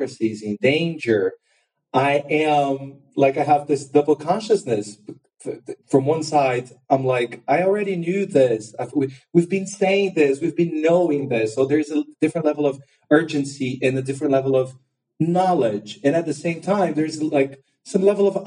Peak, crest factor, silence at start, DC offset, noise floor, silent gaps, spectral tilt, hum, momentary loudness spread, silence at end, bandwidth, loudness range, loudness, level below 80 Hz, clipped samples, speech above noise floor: -2 dBFS; 18 dB; 0 s; under 0.1%; -53 dBFS; none; -6 dB/octave; none; 8 LU; 0 s; 10.5 kHz; 2 LU; -21 LUFS; -68 dBFS; under 0.1%; 33 dB